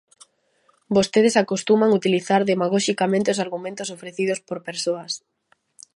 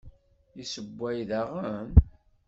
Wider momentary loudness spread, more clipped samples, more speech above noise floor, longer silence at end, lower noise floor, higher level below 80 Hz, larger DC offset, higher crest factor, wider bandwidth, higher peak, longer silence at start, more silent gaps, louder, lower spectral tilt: second, 13 LU vs 16 LU; neither; first, 43 dB vs 28 dB; first, 0.8 s vs 0.4 s; first, -63 dBFS vs -54 dBFS; second, -64 dBFS vs -32 dBFS; neither; second, 18 dB vs 24 dB; first, 11.5 kHz vs 7.6 kHz; about the same, -4 dBFS vs -4 dBFS; first, 0.9 s vs 0.05 s; neither; first, -21 LUFS vs -28 LUFS; second, -4.5 dB/octave vs -7 dB/octave